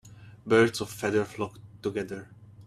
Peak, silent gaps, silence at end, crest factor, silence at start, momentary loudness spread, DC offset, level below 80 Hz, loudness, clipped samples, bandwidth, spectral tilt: -10 dBFS; none; 0 s; 20 dB; 0.05 s; 16 LU; under 0.1%; -62 dBFS; -28 LUFS; under 0.1%; 14 kHz; -5.5 dB/octave